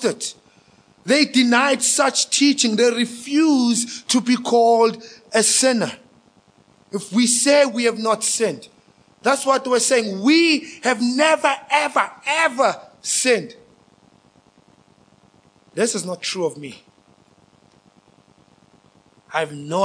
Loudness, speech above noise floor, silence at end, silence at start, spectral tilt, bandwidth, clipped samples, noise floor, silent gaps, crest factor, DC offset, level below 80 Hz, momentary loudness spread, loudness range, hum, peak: -18 LUFS; 37 dB; 0 s; 0 s; -2 dB/octave; 10.5 kHz; under 0.1%; -55 dBFS; none; 20 dB; under 0.1%; -74 dBFS; 11 LU; 11 LU; none; -2 dBFS